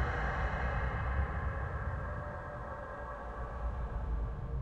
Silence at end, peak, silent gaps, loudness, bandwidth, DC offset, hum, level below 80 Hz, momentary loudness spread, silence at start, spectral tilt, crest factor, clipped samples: 0 s; -20 dBFS; none; -38 LUFS; 6.8 kHz; under 0.1%; none; -38 dBFS; 8 LU; 0 s; -8 dB/octave; 16 dB; under 0.1%